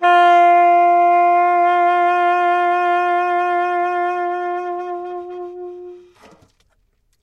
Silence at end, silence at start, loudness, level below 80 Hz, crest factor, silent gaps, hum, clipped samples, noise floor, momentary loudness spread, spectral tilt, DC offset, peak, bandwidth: 1.25 s; 0 s; -15 LUFS; -66 dBFS; 12 dB; none; none; under 0.1%; -62 dBFS; 18 LU; -3.5 dB/octave; under 0.1%; -4 dBFS; 6.8 kHz